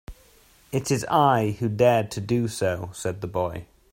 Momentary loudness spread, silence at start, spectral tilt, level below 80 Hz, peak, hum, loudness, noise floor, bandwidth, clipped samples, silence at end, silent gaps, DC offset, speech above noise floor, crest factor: 11 LU; 0.1 s; -6 dB/octave; -52 dBFS; -6 dBFS; none; -24 LUFS; -56 dBFS; 16.5 kHz; under 0.1%; 0.3 s; none; under 0.1%; 33 dB; 18 dB